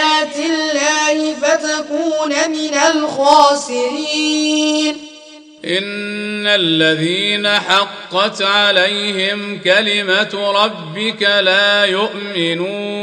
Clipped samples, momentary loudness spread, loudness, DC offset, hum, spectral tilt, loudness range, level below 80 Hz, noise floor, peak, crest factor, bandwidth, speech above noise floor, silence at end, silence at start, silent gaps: under 0.1%; 8 LU; -14 LUFS; under 0.1%; none; -2.5 dB/octave; 2 LU; -64 dBFS; -39 dBFS; 0 dBFS; 16 dB; 10.5 kHz; 24 dB; 0 s; 0 s; none